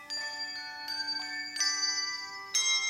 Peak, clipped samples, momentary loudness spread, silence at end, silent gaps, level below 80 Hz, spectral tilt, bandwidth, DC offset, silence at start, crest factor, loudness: -16 dBFS; under 0.1%; 9 LU; 0 s; none; -80 dBFS; 3 dB/octave; 16 kHz; under 0.1%; 0 s; 18 dB; -31 LUFS